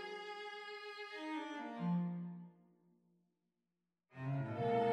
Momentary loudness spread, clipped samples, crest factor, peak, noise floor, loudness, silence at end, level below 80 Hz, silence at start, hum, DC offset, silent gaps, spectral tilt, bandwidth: 12 LU; under 0.1%; 18 dB; -24 dBFS; -90 dBFS; -43 LUFS; 0 s; -84 dBFS; 0 s; none; under 0.1%; none; -7.5 dB/octave; 8.8 kHz